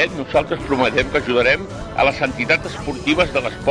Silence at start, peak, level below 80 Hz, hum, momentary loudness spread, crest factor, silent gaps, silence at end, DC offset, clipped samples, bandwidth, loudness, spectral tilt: 0 s; -4 dBFS; -38 dBFS; none; 5 LU; 16 dB; none; 0 s; under 0.1%; under 0.1%; 10.5 kHz; -18 LUFS; -5 dB/octave